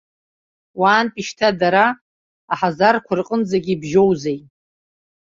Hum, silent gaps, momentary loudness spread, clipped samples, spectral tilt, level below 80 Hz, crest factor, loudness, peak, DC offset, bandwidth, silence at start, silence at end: none; 2.01-2.48 s; 11 LU; under 0.1%; -5.5 dB/octave; -58 dBFS; 18 dB; -18 LUFS; -2 dBFS; under 0.1%; 7.6 kHz; 0.75 s; 0.85 s